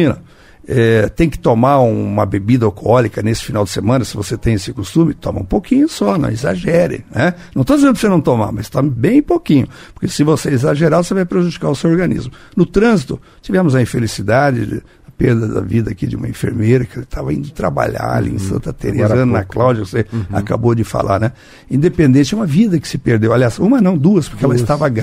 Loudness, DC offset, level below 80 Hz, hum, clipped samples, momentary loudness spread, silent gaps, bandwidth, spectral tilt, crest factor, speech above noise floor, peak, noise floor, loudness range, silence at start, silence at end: -15 LUFS; under 0.1%; -34 dBFS; none; under 0.1%; 9 LU; none; 15.5 kHz; -7 dB/octave; 14 dB; 26 dB; 0 dBFS; -40 dBFS; 3 LU; 0 s; 0 s